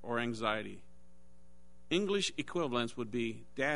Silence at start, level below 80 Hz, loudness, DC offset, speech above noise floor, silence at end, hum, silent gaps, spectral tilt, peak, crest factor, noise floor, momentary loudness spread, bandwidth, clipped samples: 0.05 s; -66 dBFS; -35 LUFS; 0.4%; 29 dB; 0 s; none; none; -4 dB/octave; -16 dBFS; 20 dB; -64 dBFS; 7 LU; 10.5 kHz; under 0.1%